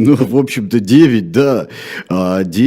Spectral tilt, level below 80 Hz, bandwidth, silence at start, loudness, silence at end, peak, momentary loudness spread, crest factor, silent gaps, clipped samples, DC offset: -7 dB/octave; -54 dBFS; 16 kHz; 0 s; -13 LUFS; 0 s; 0 dBFS; 11 LU; 12 dB; none; 0.3%; under 0.1%